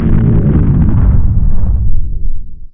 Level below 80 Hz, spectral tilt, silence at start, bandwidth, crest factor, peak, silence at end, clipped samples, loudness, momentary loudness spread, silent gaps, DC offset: -12 dBFS; -13.5 dB/octave; 0 s; 2.4 kHz; 8 dB; 0 dBFS; 0.05 s; 0.2%; -12 LUFS; 13 LU; none; under 0.1%